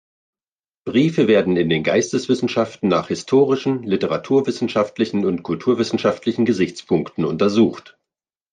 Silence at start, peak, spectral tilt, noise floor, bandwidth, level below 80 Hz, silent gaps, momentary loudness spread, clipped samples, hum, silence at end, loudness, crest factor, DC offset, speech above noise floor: 0.85 s; -4 dBFS; -6 dB/octave; under -90 dBFS; 9.6 kHz; -62 dBFS; none; 6 LU; under 0.1%; none; 0.7 s; -19 LUFS; 16 dB; under 0.1%; over 72 dB